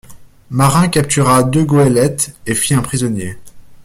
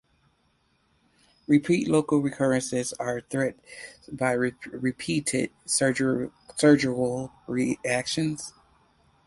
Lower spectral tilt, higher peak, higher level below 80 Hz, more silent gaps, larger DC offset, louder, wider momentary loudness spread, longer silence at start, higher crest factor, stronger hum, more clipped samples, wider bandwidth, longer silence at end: about the same, -5 dB/octave vs -4.5 dB/octave; first, 0 dBFS vs -6 dBFS; first, -42 dBFS vs -62 dBFS; neither; neither; first, -13 LUFS vs -26 LUFS; second, 9 LU vs 12 LU; second, 0.1 s vs 1.5 s; second, 14 dB vs 20 dB; neither; neither; first, 16 kHz vs 11.5 kHz; second, 0.05 s vs 0.75 s